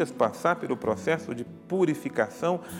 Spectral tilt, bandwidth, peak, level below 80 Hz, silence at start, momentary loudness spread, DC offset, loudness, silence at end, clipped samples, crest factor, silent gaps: -6 dB/octave; 17.5 kHz; -10 dBFS; -68 dBFS; 0 s; 6 LU; under 0.1%; -28 LUFS; 0 s; under 0.1%; 18 dB; none